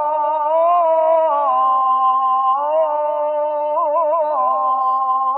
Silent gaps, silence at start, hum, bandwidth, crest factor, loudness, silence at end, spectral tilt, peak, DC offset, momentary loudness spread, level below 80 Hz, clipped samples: none; 0 s; none; 4 kHz; 10 dB; -17 LUFS; 0 s; -5.5 dB/octave; -6 dBFS; under 0.1%; 5 LU; under -90 dBFS; under 0.1%